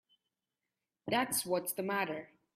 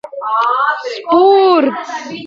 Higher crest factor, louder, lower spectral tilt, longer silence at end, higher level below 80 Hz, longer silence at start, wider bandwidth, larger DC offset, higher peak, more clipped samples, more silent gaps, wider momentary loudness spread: first, 20 dB vs 12 dB; second, -35 LUFS vs -12 LUFS; second, -3 dB/octave vs -4.5 dB/octave; first, 0.3 s vs 0 s; second, -80 dBFS vs -66 dBFS; first, 1.05 s vs 0.05 s; first, 16 kHz vs 7.4 kHz; neither; second, -18 dBFS vs 0 dBFS; neither; neither; second, 10 LU vs 13 LU